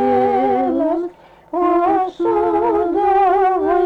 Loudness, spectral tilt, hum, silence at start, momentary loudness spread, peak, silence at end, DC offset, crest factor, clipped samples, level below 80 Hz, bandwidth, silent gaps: -16 LUFS; -7.5 dB/octave; none; 0 s; 6 LU; -6 dBFS; 0 s; under 0.1%; 10 dB; under 0.1%; -48 dBFS; 5.8 kHz; none